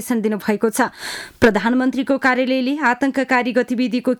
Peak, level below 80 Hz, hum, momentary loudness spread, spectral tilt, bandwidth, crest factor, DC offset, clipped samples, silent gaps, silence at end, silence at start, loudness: -4 dBFS; -50 dBFS; none; 4 LU; -4.5 dB/octave; 18.5 kHz; 14 dB; under 0.1%; under 0.1%; none; 0 s; 0 s; -18 LUFS